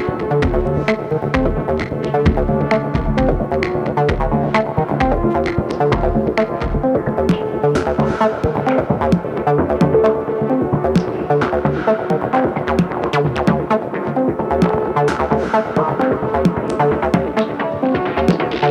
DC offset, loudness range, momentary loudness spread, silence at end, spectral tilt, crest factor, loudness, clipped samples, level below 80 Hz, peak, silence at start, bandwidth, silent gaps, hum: under 0.1%; 1 LU; 3 LU; 0 s; -8 dB/octave; 16 dB; -17 LUFS; under 0.1%; -30 dBFS; 0 dBFS; 0 s; 11.5 kHz; none; none